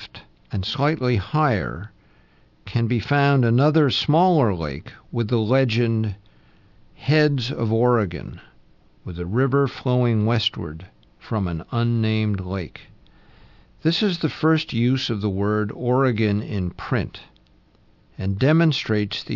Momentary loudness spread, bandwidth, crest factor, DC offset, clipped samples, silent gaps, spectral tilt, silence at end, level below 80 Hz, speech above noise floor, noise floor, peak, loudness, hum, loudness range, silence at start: 14 LU; 6 kHz; 16 dB; under 0.1%; under 0.1%; none; -7.5 dB/octave; 0 s; -50 dBFS; 35 dB; -56 dBFS; -6 dBFS; -22 LUFS; none; 4 LU; 0 s